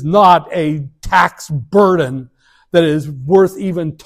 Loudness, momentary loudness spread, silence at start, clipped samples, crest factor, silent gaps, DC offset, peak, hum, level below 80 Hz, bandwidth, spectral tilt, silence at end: -14 LUFS; 11 LU; 0 s; 0.3%; 14 dB; none; under 0.1%; 0 dBFS; none; -40 dBFS; 15 kHz; -6.5 dB/octave; 0.1 s